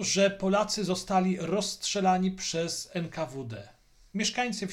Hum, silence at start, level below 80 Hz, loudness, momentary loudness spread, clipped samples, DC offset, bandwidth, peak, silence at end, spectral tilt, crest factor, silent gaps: none; 0 s; -58 dBFS; -29 LUFS; 11 LU; under 0.1%; under 0.1%; 14.5 kHz; -14 dBFS; 0 s; -4 dB/octave; 16 dB; none